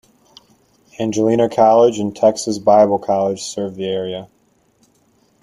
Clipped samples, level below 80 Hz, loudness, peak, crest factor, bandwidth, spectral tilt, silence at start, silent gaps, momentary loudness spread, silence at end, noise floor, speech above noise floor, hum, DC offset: under 0.1%; -58 dBFS; -16 LUFS; -2 dBFS; 16 dB; 12 kHz; -5.5 dB/octave; 1 s; none; 12 LU; 1.15 s; -58 dBFS; 42 dB; none; under 0.1%